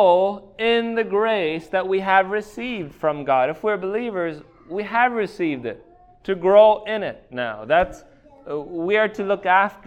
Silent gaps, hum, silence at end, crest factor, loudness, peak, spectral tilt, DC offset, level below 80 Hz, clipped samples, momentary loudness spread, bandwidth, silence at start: none; none; 0.1 s; 18 dB; -21 LUFS; -2 dBFS; -6 dB/octave; under 0.1%; -54 dBFS; under 0.1%; 13 LU; 9 kHz; 0 s